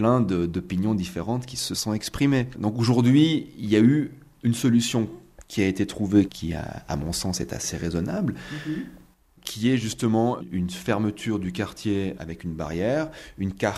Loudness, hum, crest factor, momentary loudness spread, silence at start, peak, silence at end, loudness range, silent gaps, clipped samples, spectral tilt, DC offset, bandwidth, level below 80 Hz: -25 LUFS; none; 18 dB; 12 LU; 0 s; -6 dBFS; 0 s; 6 LU; none; under 0.1%; -5.5 dB/octave; under 0.1%; 14.5 kHz; -48 dBFS